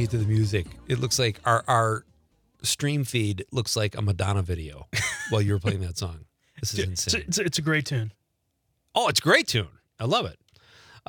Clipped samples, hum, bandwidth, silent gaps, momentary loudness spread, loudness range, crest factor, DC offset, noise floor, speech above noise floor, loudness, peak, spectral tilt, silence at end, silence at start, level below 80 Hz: under 0.1%; none; 19.5 kHz; none; 11 LU; 3 LU; 22 dB; under 0.1%; -75 dBFS; 49 dB; -25 LUFS; -4 dBFS; -4 dB/octave; 0.1 s; 0 s; -52 dBFS